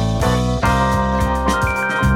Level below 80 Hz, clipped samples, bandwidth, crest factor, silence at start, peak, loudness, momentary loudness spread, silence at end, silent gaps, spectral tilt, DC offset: -24 dBFS; under 0.1%; 16.5 kHz; 14 dB; 0 s; -4 dBFS; -17 LUFS; 2 LU; 0 s; none; -6 dB/octave; under 0.1%